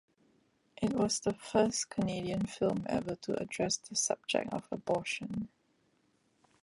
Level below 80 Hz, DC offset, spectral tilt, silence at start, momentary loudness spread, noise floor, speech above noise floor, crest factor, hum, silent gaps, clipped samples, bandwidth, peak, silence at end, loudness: -64 dBFS; under 0.1%; -4 dB/octave; 0.8 s; 7 LU; -73 dBFS; 39 dB; 22 dB; none; none; under 0.1%; 11.5 kHz; -14 dBFS; 1.15 s; -34 LUFS